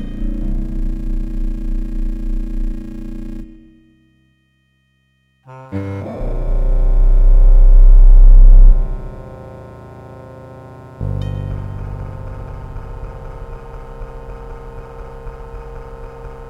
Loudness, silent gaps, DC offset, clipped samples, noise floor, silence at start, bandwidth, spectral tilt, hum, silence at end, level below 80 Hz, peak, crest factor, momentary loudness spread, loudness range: -18 LUFS; none; under 0.1%; 0.3%; -60 dBFS; 0 s; 2.3 kHz; -9.5 dB/octave; none; 0 s; -14 dBFS; 0 dBFS; 14 dB; 24 LU; 19 LU